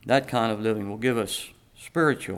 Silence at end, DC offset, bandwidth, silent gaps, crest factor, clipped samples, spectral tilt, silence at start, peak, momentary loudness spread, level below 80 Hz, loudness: 0 s; under 0.1%; 17 kHz; none; 18 dB; under 0.1%; -5 dB/octave; 0.05 s; -8 dBFS; 10 LU; -60 dBFS; -26 LUFS